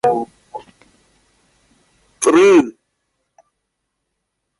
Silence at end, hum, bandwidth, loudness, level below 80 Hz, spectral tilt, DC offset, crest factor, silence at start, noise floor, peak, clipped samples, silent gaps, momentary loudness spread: 1.9 s; none; 11.5 kHz; -14 LUFS; -62 dBFS; -4 dB/octave; under 0.1%; 20 dB; 0.05 s; -75 dBFS; 0 dBFS; under 0.1%; none; 26 LU